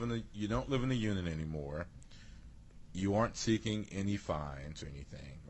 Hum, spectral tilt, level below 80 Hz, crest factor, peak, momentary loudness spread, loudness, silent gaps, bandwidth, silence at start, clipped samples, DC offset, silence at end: none; -6 dB/octave; -52 dBFS; 18 dB; -20 dBFS; 18 LU; -37 LUFS; none; 8.6 kHz; 0 s; under 0.1%; under 0.1%; 0 s